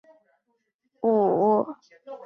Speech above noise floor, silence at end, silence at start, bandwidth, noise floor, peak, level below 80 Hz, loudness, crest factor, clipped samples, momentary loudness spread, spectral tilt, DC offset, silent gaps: 51 dB; 0.1 s; 1.05 s; 6 kHz; -75 dBFS; -10 dBFS; -76 dBFS; -23 LUFS; 16 dB; under 0.1%; 22 LU; -10.5 dB/octave; under 0.1%; none